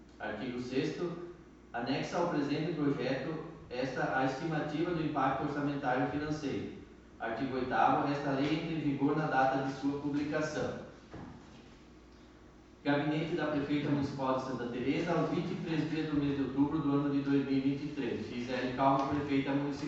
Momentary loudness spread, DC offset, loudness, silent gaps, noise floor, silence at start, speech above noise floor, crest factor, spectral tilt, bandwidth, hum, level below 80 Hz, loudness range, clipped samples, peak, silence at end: 10 LU; under 0.1%; -34 LUFS; none; -56 dBFS; 0 s; 23 dB; 18 dB; -7 dB/octave; 7.8 kHz; none; -60 dBFS; 4 LU; under 0.1%; -16 dBFS; 0 s